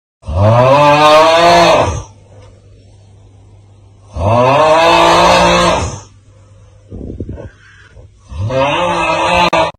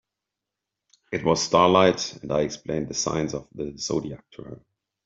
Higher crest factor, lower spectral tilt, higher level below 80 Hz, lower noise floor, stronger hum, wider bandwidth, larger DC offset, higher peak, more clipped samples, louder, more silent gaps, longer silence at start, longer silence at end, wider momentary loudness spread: second, 12 dB vs 22 dB; about the same, -4.5 dB/octave vs -4 dB/octave; first, -32 dBFS vs -54 dBFS; second, -41 dBFS vs -86 dBFS; neither; first, 15.5 kHz vs 7.8 kHz; neither; first, 0 dBFS vs -4 dBFS; neither; first, -9 LUFS vs -24 LUFS; neither; second, 0.25 s vs 1.1 s; second, 0.05 s vs 0.45 s; about the same, 21 LU vs 21 LU